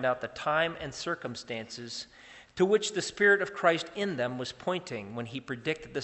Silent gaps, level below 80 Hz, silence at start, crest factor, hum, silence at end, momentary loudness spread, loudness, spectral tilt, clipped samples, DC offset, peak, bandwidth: none; -66 dBFS; 0 s; 22 dB; none; 0 s; 14 LU; -30 LUFS; -4 dB/octave; under 0.1%; under 0.1%; -10 dBFS; 8.4 kHz